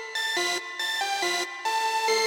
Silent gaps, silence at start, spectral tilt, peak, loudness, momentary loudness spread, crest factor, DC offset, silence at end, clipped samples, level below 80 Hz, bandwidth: none; 0 s; 1 dB/octave; -10 dBFS; -26 LUFS; 3 LU; 16 dB; under 0.1%; 0 s; under 0.1%; -88 dBFS; 16.5 kHz